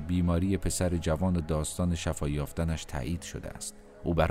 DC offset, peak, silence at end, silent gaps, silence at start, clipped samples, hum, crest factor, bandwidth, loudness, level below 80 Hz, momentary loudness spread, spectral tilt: under 0.1%; -12 dBFS; 0 s; none; 0 s; under 0.1%; none; 18 dB; 15.5 kHz; -31 LUFS; -40 dBFS; 10 LU; -6 dB/octave